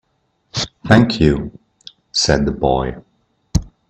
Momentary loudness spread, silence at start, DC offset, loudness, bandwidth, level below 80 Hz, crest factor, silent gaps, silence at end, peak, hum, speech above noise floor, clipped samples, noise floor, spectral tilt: 12 LU; 0.55 s; under 0.1%; -17 LUFS; 9.2 kHz; -32 dBFS; 18 dB; none; 0.25 s; 0 dBFS; none; 51 dB; under 0.1%; -65 dBFS; -5 dB/octave